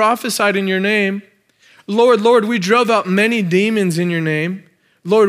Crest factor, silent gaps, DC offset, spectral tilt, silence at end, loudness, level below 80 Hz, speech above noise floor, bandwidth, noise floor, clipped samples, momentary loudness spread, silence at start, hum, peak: 14 dB; none; under 0.1%; -5 dB/octave; 0 s; -15 LUFS; -76 dBFS; 36 dB; 16 kHz; -51 dBFS; under 0.1%; 9 LU; 0 s; none; 0 dBFS